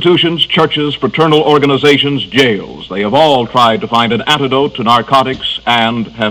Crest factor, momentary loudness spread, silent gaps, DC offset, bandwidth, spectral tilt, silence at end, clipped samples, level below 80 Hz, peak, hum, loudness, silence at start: 10 dB; 6 LU; none; under 0.1%; 16.5 kHz; -5.5 dB/octave; 0 s; 1%; -44 dBFS; 0 dBFS; none; -11 LUFS; 0 s